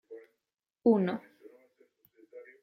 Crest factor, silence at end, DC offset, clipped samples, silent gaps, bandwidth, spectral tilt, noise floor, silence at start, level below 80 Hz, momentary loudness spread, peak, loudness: 20 dB; 0.2 s; under 0.1%; under 0.1%; none; 15 kHz; -10 dB/octave; -88 dBFS; 0.1 s; -78 dBFS; 26 LU; -14 dBFS; -29 LUFS